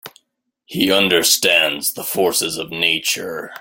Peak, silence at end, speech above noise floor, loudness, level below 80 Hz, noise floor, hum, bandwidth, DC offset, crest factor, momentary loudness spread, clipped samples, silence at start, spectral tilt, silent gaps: 0 dBFS; 0 s; 52 dB; -16 LUFS; -60 dBFS; -70 dBFS; none; 17 kHz; under 0.1%; 18 dB; 10 LU; under 0.1%; 0.05 s; -1.5 dB/octave; none